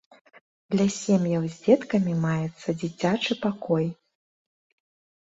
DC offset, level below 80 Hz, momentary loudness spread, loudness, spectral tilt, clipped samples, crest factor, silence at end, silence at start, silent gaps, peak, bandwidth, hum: under 0.1%; -64 dBFS; 8 LU; -25 LUFS; -6 dB/octave; under 0.1%; 20 dB; 1.3 s; 0.7 s; none; -6 dBFS; 8 kHz; none